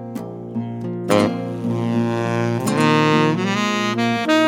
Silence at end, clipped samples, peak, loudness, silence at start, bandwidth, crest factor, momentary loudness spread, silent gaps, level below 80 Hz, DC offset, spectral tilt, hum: 0 s; under 0.1%; -2 dBFS; -19 LUFS; 0 s; 17 kHz; 18 dB; 12 LU; none; -62 dBFS; under 0.1%; -5.5 dB/octave; none